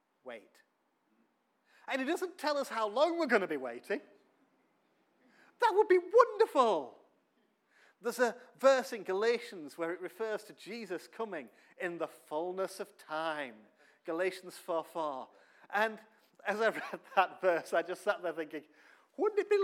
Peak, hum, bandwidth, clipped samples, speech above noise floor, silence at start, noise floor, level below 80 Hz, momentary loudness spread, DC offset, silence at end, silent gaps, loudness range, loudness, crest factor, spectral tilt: -10 dBFS; none; 16 kHz; under 0.1%; 42 dB; 0.25 s; -75 dBFS; under -90 dBFS; 18 LU; under 0.1%; 0 s; none; 9 LU; -33 LUFS; 26 dB; -4 dB/octave